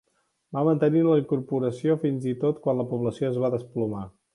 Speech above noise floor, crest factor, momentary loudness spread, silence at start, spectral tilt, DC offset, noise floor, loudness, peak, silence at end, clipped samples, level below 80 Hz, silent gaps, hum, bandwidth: 38 dB; 16 dB; 9 LU; 0.5 s; -9 dB/octave; under 0.1%; -63 dBFS; -25 LUFS; -10 dBFS; 0.25 s; under 0.1%; -64 dBFS; none; none; 11 kHz